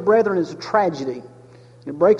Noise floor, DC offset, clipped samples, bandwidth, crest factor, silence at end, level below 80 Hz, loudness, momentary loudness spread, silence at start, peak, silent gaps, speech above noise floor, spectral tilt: -46 dBFS; under 0.1%; under 0.1%; 7.6 kHz; 16 dB; 0 s; -64 dBFS; -21 LUFS; 18 LU; 0 s; -4 dBFS; none; 27 dB; -6.5 dB/octave